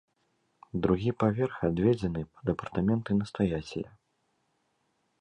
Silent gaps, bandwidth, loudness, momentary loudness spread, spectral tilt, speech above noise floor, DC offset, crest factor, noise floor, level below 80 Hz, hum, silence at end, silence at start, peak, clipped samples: none; 9.6 kHz; -30 LUFS; 10 LU; -8.5 dB/octave; 47 dB; under 0.1%; 20 dB; -75 dBFS; -52 dBFS; none; 1.35 s; 0.75 s; -12 dBFS; under 0.1%